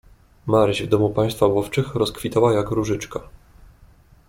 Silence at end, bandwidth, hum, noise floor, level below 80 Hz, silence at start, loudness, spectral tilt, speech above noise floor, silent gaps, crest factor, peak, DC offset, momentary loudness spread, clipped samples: 1.05 s; 16.5 kHz; none; -51 dBFS; -46 dBFS; 0.45 s; -20 LUFS; -6.5 dB/octave; 31 dB; none; 18 dB; -4 dBFS; under 0.1%; 9 LU; under 0.1%